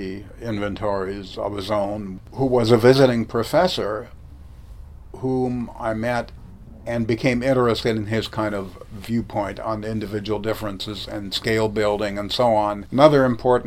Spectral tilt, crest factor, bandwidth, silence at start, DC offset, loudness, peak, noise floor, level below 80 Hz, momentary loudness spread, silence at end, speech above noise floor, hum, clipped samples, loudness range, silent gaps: -6.5 dB/octave; 22 dB; 16 kHz; 0 s; under 0.1%; -21 LUFS; 0 dBFS; -41 dBFS; -44 dBFS; 15 LU; 0 s; 20 dB; none; under 0.1%; 6 LU; none